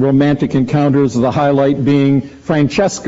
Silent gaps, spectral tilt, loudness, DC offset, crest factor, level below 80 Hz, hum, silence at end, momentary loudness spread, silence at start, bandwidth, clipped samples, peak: none; -7 dB/octave; -13 LUFS; under 0.1%; 12 dB; -42 dBFS; none; 0 s; 3 LU; 0 s; 8 kHz; under 0.1%; 0 dBFS